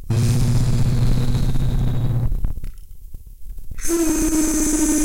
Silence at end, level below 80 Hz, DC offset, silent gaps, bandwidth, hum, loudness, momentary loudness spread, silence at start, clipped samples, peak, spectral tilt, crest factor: 0 s; -24 dBFS; 2%; none; 17 kHz; none; -20 LUFS; 16 LU; 0 s; under 0.1%; -6 dBFS; -5.5 dB/octave; 12 dB